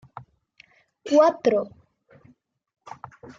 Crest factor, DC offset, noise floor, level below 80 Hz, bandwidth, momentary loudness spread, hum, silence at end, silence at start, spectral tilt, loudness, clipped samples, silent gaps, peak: 20 dB; under 0.1%; -59 dBFS; -70 dBFS; 7.4 kHz; 27 LU; none; 1.7 s; 0.15 s; -5.5 dB/octave; -21 LUFS; under 0.1%; none; -6 dBFS